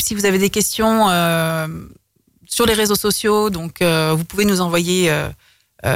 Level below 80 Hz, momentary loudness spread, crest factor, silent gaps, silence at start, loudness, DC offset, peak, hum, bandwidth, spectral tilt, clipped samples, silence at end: -42 dBFS; 9 LU; 12 dB; none; 0 s; -17 LUFS; under 0.1%; -4 dBFS; none; 16.5 kHz; -4 dB/octave; under 0.1%; 0 s